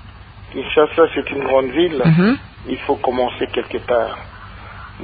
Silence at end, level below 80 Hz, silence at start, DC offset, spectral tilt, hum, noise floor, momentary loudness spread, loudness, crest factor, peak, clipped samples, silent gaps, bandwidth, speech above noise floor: 0 s; -42 dBFS; 0.05 s; under 0.1%; -12 dB/octave; none; -38 dBFS; 20 LU; -18 LUFS; 16 dB; -2 dBFS; under 0.1%; none; 4.9 kHz; 21 dB